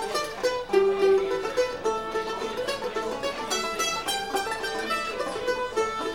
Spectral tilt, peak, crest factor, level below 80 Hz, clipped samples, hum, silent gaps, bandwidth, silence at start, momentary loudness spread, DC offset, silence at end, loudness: -2.5 dB/octave; -10 dBFS; 16 dB; -54 dBFS; under 0.1%; none; none; 18 kHz; 0 s; 8 LU; under 0.1%; 0 s; -27 LUFS